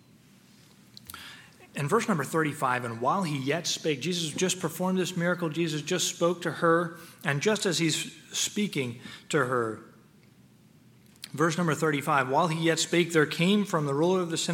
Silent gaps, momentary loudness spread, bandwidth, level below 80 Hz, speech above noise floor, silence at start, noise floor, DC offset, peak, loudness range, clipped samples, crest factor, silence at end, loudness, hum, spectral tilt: none; 11 LU; 17 kHz; -74 dBFS; 30 dB; 1.1 s; -57 dBFS; under 0.1%; -8 dBFS; 5 LU; under 0.1%; 20 dB; 0 s; -27 LUFS; none; -4 dB/octave